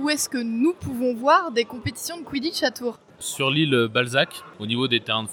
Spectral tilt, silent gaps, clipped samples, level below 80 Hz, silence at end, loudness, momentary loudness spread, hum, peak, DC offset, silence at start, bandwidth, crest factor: -4 dB/octave; none; under 0.1%; -58 dBFS; 0 s; -23 LUFS; 12 LU; none; -4 dBFS; under 0.1%; 0 s; 19 kHz; 18 dB